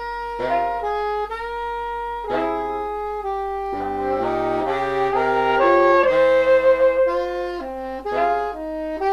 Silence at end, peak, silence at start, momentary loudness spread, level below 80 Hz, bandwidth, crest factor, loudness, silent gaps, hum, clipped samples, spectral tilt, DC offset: 0 s; -4 dBFS; 0 s; 12 LU; -46 dBFS; 8.8 kHz; 16 dB; -21 LUFS; none; none; under 0.1%; -6 dB/octave; under 0.1%